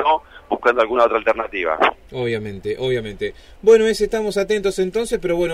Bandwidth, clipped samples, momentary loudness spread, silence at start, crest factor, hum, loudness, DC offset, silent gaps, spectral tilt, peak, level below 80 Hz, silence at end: 14.5 kHz; under 0.1%; 12 LU; 0 s; 16 dB; none; -19 LUFS; under 0.1%; none; -5 dB/octave; -4 dBFS; -44 dBFS; 0 s